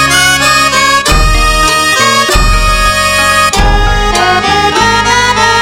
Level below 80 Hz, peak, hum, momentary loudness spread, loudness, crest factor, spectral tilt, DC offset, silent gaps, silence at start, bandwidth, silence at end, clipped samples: -14 dBFS; 0 dBFS; none; 3 LU; -7 LUFS; 8 dB; -2.5 dB/octave; under 0.1%; none; 0 s; 17 kHz; 0 s; 0.8%